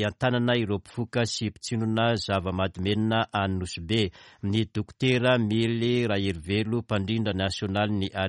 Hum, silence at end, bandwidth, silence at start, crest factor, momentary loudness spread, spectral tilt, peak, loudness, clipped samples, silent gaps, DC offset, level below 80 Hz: none; 0 s; 11.5 kHz; 0 s; 16 dB; 7 LU; -6 dB/octave; -10 dBFS; -27 LUFS; under 0.1%; none; under 0.1%; -54 dBFS